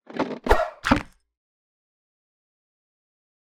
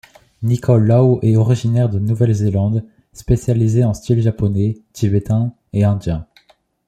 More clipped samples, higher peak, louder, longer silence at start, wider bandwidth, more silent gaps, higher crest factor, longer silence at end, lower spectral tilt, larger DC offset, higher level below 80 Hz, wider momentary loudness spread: neither; about the same, -2 dBFS vs -2 dBFS; second, -24 LUFS vs -17 LUFS; second, 0.1 s vs 0.4 s; first, 17.5 kHz vs 9.4 kHz; neither; first, 26 dB vs 14 dB; first, 2.45 s vs 0.65 s; second, -5.5 dB/octave vs -8.5 dB/octave; neither; about the same, -36 dBFS vs -38 dBFS; about the same, 7 LU vs 9 LU